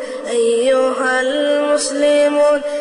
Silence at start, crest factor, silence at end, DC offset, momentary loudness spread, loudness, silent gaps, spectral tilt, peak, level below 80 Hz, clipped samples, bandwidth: 0 s; 10 dB; 0 s; under 0.1%; 3 LU; -15 LUFS; none; -1.5 dB/octave; -6 dBFS; -58 dBFS; under 0.1%; 11 kHz